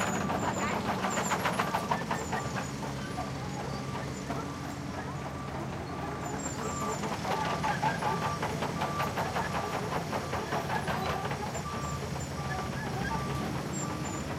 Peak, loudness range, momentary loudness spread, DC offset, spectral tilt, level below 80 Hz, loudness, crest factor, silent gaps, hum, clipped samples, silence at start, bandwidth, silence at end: -14 dBFS; 5 LU; 7 LU; under 0.1%; -4.5 dB/octave; -50 dBFS; -33 LUFS; 20 dB; none; none; under 0.1%; 0 s; 16 kHz; 0 s